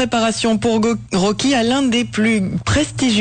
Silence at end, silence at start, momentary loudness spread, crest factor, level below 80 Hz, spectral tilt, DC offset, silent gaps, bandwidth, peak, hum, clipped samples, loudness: 0 s; 0 s; 3 LU; 10 dB; -40 dBFS; -4.5 dB/octave; under 0.1%; none; 9.4 kHz; -8 dBFS; none; under 0.1%; -17 LUFS